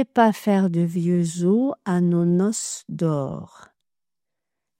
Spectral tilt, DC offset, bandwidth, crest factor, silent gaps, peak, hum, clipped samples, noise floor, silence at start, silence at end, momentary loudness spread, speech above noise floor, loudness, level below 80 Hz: -6.5 dB/octave; under 0.1%; 15.5 kHz; 18 dB; none; -4 dBFS; none; under 0.1%; -89 dBFS; 0 s; 1.35 s; 8 LU; 68 dB; -22 LUFS; -64 dBFS